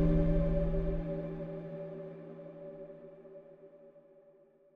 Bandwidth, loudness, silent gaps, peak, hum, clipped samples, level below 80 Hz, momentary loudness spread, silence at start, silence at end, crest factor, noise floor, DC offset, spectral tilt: 4 kHz; -36 LUFS; none; -18 dBFS; none; under 0.1%; -40 dBFS; 23 LU; 0 s; 0.75 s; 18 dB; -63 dBFS; under 0.1%; -11 dB/octave